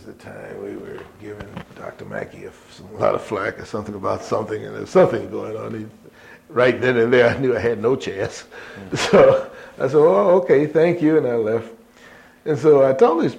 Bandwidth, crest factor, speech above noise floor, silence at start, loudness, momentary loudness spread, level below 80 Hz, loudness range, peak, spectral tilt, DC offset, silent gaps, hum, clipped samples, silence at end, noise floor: 11 kHz; 18 dB; 27 dB; 0.05 s; -18 LUFS; 22 LU; -54 dBFS; 11 LU; 0 dBFS; -6 dB/octave; under 0.1%; none; none; under 0.1%; 0 s; -46 dBFS